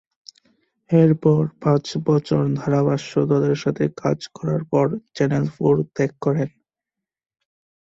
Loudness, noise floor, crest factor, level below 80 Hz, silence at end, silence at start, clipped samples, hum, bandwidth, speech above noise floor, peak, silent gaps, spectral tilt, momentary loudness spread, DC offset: -20 LUFS; -86 dBFS; 18 dB; -58 dBFS; 1.35 s; 0.9 s; under 0.1%; none; 7.8 kHz; 67 dB; -4 dBFS; none; -8 dB/octave; 7 LU; under 0.1%